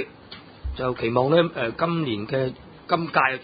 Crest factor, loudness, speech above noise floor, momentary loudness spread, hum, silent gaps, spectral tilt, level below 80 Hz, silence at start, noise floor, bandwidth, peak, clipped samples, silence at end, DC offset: 20 dB; -24 LUFS; 22 dB; 17 LU; none; none; -11 dB/octave; -44 dBFS; 0 s; -44 dBFS; 5 kHz; -4 dBFS; under 0.1%; 0 s; under 0.1%